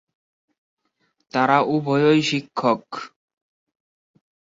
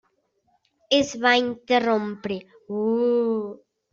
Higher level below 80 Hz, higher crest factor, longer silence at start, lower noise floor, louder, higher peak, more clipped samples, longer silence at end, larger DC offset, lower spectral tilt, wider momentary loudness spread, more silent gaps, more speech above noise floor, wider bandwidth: about the same, -68 dBFS vs -64 dBFS; about the same, 20 dB vs 20 dB; first, 1.35 s vs 0.9 s; about the same, -70 dBFS vs -69 dBFS; first, -20 LUFS vs -23 LUFS; about the same, -4 dBFS vs -6 dBFS; neither; first, 1.5 s vs 0.35 s; neither; first, -5.5 dB/octave vs -4 dB/octave; first, 17 LU vs 13 LU; neither; about the same, 50 dB vs 47 dB; about the same, 7.8 kHz vs 7.6 kHz